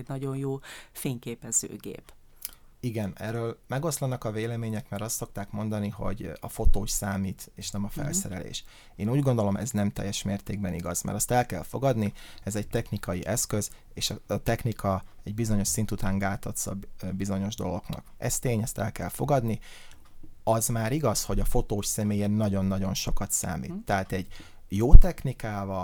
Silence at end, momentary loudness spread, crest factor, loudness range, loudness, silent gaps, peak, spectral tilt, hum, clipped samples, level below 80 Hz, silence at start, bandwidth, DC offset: 0 s; 11 LU; 26 dB; 5 LU; -29 LUFS; none; 0 dBFS; -5 dB/octave; none; under 0.1%; -30 dBFS; 0 s; 18.5 kHz; under 0.1%